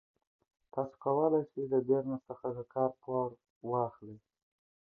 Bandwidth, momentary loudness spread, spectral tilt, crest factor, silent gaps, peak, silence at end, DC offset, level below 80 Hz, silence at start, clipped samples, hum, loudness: 2 kHz; 11 LU; -12.5 dB/octave; 18 dB; 3.50-3.61 s; -16 dBFS; 0.85 s; under 0.1%; -76 dBFS; 0.75 s; under 0.1%; none; -34 LUFS